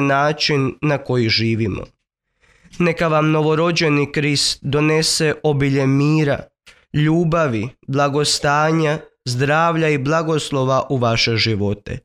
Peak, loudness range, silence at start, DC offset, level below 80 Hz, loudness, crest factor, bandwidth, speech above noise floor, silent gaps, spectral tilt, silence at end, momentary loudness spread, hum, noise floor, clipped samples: -4 dBFS; 2 LU; 0 s; under 0.1%; -46 dBFS; -17 LUFS; 14 dB; 13.5 kHz; 47 dB; none; -5 dB/octave; 0.05 s; 6 LU; none; -64 dBFS; under 0.1%